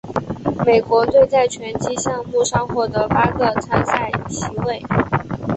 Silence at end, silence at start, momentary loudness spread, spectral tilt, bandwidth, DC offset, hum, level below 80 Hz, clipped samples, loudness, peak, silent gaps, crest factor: 0 s; 0.05 s; 10 LU; -5.5 dB/octave; 8.4 kHz; under 0.1%; none; -42 dBFS; under 0.1%; -18 LUFS; -2 dBFS; none; 16 dB